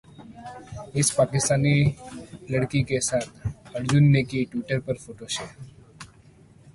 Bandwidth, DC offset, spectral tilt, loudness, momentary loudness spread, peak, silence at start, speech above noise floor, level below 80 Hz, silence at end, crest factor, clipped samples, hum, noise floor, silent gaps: 11.5 kHz; under 0.1%; -5 dB/octave; -24 LUFS; 21 LU; -8 dBFS; 0.2 s; 29 dB; -50 dBFS; 0.7 s; 16 dB; under 0.1%; none; -53 dBFS; none